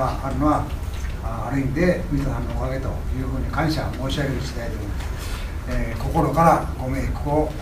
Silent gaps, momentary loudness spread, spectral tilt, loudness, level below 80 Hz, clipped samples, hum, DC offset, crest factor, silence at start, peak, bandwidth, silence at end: none; 10 LU; -6.5 dB/octave; -24 LUFS; -28 dBFS; under 0.1%; none; under 0.1%; 20 dB; 0 s; -2 dBFS; 16 kHz; 0 s